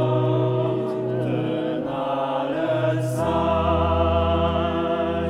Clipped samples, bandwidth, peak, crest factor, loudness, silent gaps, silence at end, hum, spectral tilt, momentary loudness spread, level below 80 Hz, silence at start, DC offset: under 0.1%; 13 kHz; -8 dBFS; 14 dB; -23 LUFS; none; 0 s; none; -8 dB/octave; 5 LU; -36 dBFS; 0 s; under 0.1%